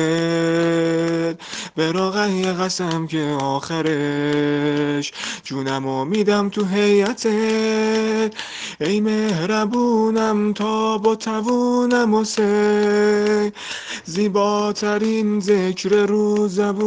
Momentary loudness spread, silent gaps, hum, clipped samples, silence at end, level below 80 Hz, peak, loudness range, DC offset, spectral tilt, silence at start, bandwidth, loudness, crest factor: 7 LU; none; none; under 0.1%; 0 s; -62 dBFS; -4 dBFS; 3 LU; under 0.1%; -5 dB/octave; 0 s; 9.6 kHz; -19 LUFS; 14 dB